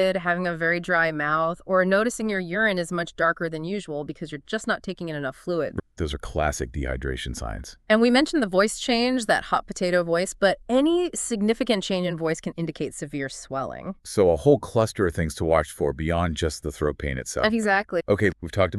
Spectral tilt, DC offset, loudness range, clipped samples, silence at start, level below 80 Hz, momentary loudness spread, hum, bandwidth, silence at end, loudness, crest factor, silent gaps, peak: -5 dB/octave; under 0.1%; 6 LU; under 0.1%; 0 s; -42 dBFS; 10 LU; none; 13.5 kHz; 0 s; -24 LUFS; 20 dB; none; -4 dBFS